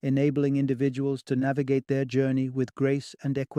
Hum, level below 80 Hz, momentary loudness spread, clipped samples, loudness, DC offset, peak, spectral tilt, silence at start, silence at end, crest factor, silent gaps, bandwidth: none; -66 dBFS; 5 LU; under 0.1%; -27 LUFS; under 0.1%; -12 dBFS; -8 dB/octave; 0.05 s; 0 s; 14 dB; none; 10 kHz